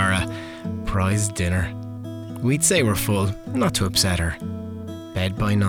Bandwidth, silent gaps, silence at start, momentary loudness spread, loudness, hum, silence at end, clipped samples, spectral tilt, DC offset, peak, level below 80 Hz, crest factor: 19.5 kHz; none; 0 s; 15 LU; -22 LUFS; none; 0 s; under 0.1%; -4.5 dB/octave; under 0.1%; -10 dBFS; -40 dBFS; 14 dB